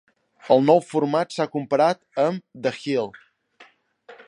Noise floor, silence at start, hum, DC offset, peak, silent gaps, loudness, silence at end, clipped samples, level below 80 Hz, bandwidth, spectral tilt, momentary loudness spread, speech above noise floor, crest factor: -54 dBFS; 0.45 s; none; under 0.1%; -2 dBFS; none; -22 LUFS; 0.15 s; under 0.1%; -74 dBFS; 10.5 kHz; -6.5 dB/octave; 10 LU; 33 dB; 20 dB